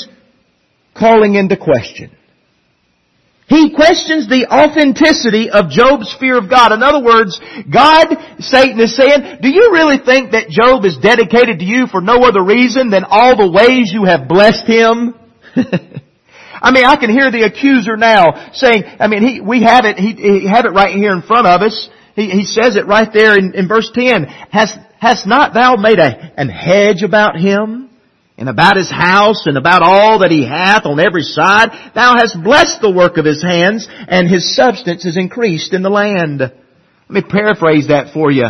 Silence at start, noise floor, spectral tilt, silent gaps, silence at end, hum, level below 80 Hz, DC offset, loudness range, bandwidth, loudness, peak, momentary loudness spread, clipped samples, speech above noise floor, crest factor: 0 s; -58 dBFS; -5 dB/octave; none; 0 s; none; -44 dBFS; under 0.1%; 4 LU; 12 kHz; -9 LUFS; 0 dBFS; 8 LU; 0.3%; 49 dB; 10 dB